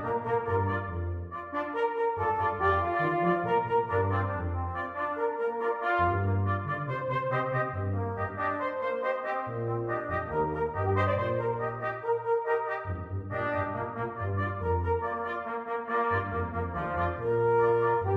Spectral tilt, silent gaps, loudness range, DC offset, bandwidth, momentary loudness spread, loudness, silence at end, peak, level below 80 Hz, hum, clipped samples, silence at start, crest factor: -9 dB/octave; none; 3 LU; under 0.1%; 5 kHz; 7 LU; -30 LUFS; 0 s; -14 dBFS; -50 dBFS; none; under 0.1%; 0 s; 16 dB